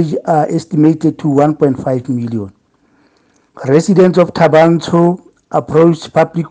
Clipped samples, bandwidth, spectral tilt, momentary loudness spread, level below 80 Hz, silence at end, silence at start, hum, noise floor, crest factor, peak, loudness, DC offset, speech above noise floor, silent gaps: 0.1%; 9.4 kHz; -7.5 dB/octave; 10 LU; -54 dBFS; 0.05 s; 0 s; none; -54 dBFS; 12 dB; 0 dBFS; -12 LUFS; under 0.1%; 42 dB; none